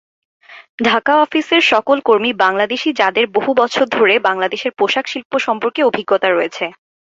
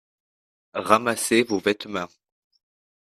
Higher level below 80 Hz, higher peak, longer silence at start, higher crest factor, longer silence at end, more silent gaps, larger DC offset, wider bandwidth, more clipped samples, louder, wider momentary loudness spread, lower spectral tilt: about the same, -62 dBFS vs -64 dBFS; about the same, -2 dBFS vs 0 dBFS; second, 0.5 s vs 0.75 s; second, 14 dB vs 26 dB; second, 0.4 s vs 1.05 s; first, 0.69-0.78 s, 5.25-5.30 s vs none; neither; second, 7.8 kHz vs 14 kHz; neither; first, -15 LUFS vs -23 LUFS; second, 7 LU vs 13 LU; about the same, -3.5 dB/octave vs -3.5 dB/octave